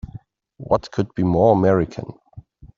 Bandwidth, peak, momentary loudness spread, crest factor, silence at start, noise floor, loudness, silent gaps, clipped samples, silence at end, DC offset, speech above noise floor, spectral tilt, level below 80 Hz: 7.4 kHz; -2 dBFS; 22 LU; 18 dB; 0.05 s; -44 dBFS; -19 LUFS; none; under 0.1%; 0.1 s; under 0.1%; 25 dB; -8 dB/octave; -44 dBFS